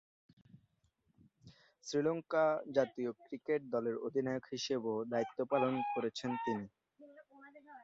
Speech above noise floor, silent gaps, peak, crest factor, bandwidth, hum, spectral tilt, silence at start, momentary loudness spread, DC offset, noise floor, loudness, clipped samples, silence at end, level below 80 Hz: 41 dB; none; -18 dBFS; 20 dB; 7.6 kHz; none; -4.5 dB/octave; 0.55 s; 9 LU; under 0.1%; -78 dBFS; -37 LUFS; under 0.1%; 0 s; -78 dBFS